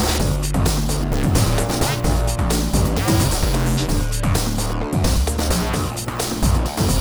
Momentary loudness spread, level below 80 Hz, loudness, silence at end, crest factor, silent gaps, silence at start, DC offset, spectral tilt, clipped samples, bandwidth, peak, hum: 4 LU; -22 dBFS; -20 LUFS; 0 s; 16 dB; none; 0 s; under 0.1%; -5 dB/octave; under 0.1%; over 20 kHz; -4 dBFS; none